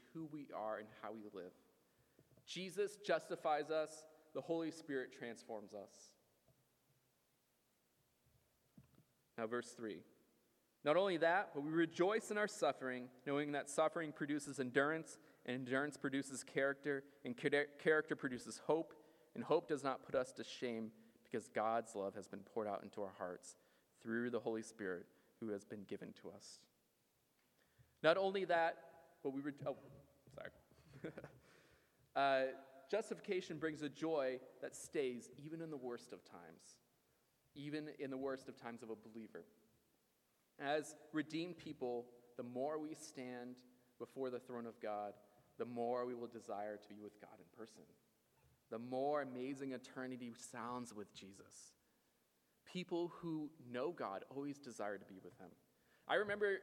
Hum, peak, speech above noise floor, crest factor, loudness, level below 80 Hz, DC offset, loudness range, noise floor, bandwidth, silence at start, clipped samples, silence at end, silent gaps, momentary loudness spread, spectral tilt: none; -18 dBFS; 38 dB; 26 dB; -44 LUFS; -88 dBFS; under 0.1%; 10 LU; -81 dBFS; 17.5 kHz; 0.15 s; under 0.1%; 0 s; none; 19 LU; -4.5 dB/octave